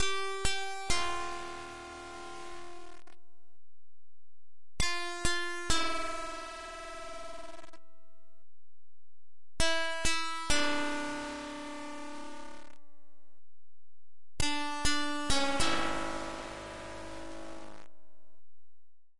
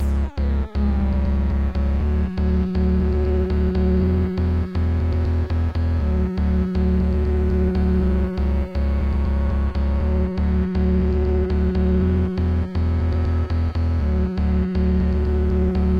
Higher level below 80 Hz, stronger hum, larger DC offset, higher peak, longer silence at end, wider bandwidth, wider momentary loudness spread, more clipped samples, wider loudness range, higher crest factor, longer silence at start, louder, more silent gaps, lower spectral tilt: second, -48 dBFS vs -22 dBFS; neither; neither; second, -14 dBFS vs -10 dBFS; about the same, 0 s vs 0 s; first, 11.5 kHz vs 5.2 kHz; first, 17 LU vs 3 LU; neither; first, 11 LU vs 1 LU; first, 20 dB vs 10 dB; about the same, 0 s vs 0 s; second, -34 LUFS vs -21 LUFS; neither; second, -2.5 dB/octave vs -10 dB/octave